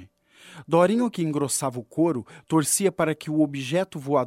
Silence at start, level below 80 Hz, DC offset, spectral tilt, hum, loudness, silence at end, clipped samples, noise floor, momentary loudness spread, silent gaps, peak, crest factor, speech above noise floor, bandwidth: 0 s; -66 dBFS; under 0.1%; -5 dB/octave; none; -24 LUFS; 0 s; under 0.1%; -52 dBFS; 6 LU; none; -6 dBFS; 18 dB; 28 dB; 16 kHz